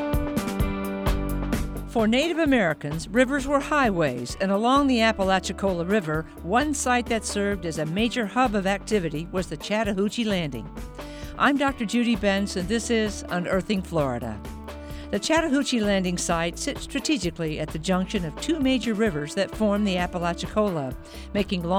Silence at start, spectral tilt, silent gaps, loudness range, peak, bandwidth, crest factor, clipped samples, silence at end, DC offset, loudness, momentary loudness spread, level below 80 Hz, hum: 0 s; -5 dB/octave; none; 3 LU; -6 dBFS; 18 kHz; 18 dB; under 0.1%; 0 s; under 0.1%; -25 LUFS; 9 LU; -38 dBFS; none